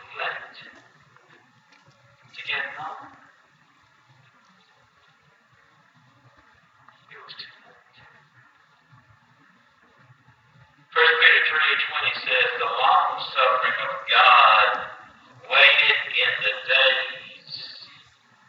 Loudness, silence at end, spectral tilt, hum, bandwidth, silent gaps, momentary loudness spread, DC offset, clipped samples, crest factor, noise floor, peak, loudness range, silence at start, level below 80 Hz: -18 LUFS; 0.65 s; -2 dB/octave; none; 7.6 kHz; none; 24 LU; under 0.1%; under 0.1%; 24 dB; -59 dBFS; -2 dBFS; 18 LU; 0.1 s; -76 dBFS